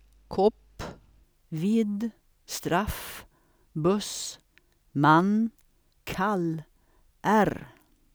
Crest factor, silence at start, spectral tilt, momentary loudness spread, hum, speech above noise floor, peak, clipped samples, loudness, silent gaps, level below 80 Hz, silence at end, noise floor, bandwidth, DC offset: 22 dB; 0.3 s; -5.5 dB/octave; 20 LU; none; 38 dB; -8 dBFS; under 0.1%; -27 LUFS; none; -52 dBFS; 0.45 s; -64 dBFS; over 20 kHz; under 0.1%